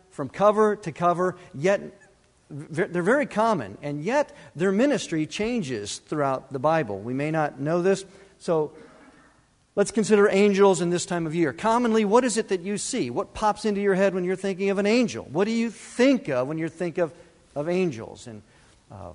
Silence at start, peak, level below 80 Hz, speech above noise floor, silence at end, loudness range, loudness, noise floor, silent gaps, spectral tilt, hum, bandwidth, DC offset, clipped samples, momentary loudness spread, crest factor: 0.2 s; -4 dBFS; -58 dBFS; 37 dB; 0 s; 5 LU; -24 LUFS; -60 dBFS; none; -5.5 dB/octave; none; 11 kHz; under 0.1%; under 0.1%; 12 LU; 20 dB